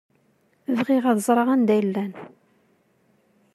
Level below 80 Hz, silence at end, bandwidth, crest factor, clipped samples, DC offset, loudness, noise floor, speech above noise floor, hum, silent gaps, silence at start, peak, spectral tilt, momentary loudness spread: -78 dBFS; 1.3 s; 14 kHz; 18 dB; under 0.1%; under 0.1%; -22 LUFS; -64 dBFS; 43 dB; none; none; 0.7 s; -6 dBFS; -6 dB/octave; 15 LU